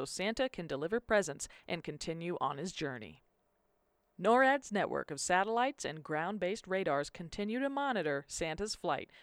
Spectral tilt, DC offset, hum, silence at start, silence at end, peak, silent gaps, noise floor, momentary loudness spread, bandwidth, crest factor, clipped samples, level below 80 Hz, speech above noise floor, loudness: -4 dB/octave; under 0.1%; none; 0 s; 0 s; -16 dBFS; none; -77 dBFS; 11 LU; 14.5 kHz; 20 dB; under 0.1%; -62 dBFS; 42 dB; -35 LUFS